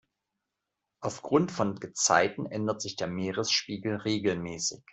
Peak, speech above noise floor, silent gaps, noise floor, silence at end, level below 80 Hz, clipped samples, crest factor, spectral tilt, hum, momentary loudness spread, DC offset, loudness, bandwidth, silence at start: -8 dBFS; 56 dB; none; -86 dBFS; 0.15 s; -66 dBFS; under 0.1%; 22 dB; -3.5 dB/octave; none; 9 LU; under 0.1%; -29 LUFS; 8.2 kHz; 1 s